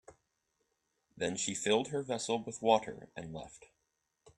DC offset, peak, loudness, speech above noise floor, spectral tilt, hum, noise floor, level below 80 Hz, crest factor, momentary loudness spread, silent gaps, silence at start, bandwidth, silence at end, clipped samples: under 0.1%; -14 dBFS; -34 LUFS; 47 dB; -3.5 dB/octave; none; -81 dBFS; -70 dBFS; 24 dB; 16 LU; none; 0.1 s; 12 kHz; 0.1 s; under 0.1%